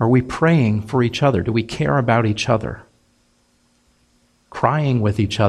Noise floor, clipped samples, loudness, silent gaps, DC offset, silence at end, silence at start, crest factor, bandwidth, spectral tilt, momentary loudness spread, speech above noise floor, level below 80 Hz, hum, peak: -60 dBFS; under 0.1%; -18 LUFS; none; under 0.1%; 0 s; 0 s; 18 dB; 11 kHz; -7 dB/octave; 5 LU; 43 dB; -44 dBFS; none; 0 dBFS